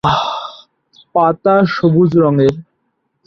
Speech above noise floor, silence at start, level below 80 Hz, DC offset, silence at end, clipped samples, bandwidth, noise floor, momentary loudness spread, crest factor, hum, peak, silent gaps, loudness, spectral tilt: 56 dB; 0.05 s; -46 dBFS; under 0.1%; 0.65 s; under 0.1%; 7.2 kHz; -67 dBFS; 13 LU; 14 dB; none; -2 dBFS; none; -13 LUFS; -8 dB/octave